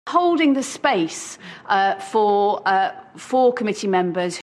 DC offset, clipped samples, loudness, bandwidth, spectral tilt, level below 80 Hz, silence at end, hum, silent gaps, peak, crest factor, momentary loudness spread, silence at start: under 0.1%; under 0.1%; -20 LUFS; 12.5 kHz; -4.5 dB/octave; -72 dBFS; 0.05 s; none; none; -4 dBFS; 16 dB; 9 LU; 0.05 s